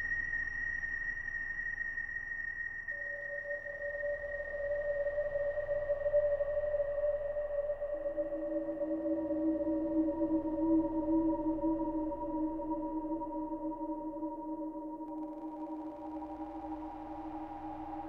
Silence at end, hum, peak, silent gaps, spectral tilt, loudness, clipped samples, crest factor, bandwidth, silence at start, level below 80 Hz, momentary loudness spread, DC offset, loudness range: 0 s; none; -20 dBFS; none; -8.5 dB/octave; -36 LUFS; under 0.1%; 16 dB; 6 kHz; 0 s; -54 dBFS; 11 LU; under 0.1%; 8 LU